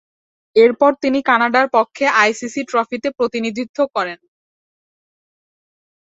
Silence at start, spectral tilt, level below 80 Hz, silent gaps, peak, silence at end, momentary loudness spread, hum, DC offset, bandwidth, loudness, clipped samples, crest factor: 0.55 s; -3.5 dB/octave; -64 dBFS; 3.69-3.74 s; -2 dBFS; 1.85 s; 9 LU; none; under 0.1%; 8 kHz; -16 LUFS; under 0.1%; 18 dB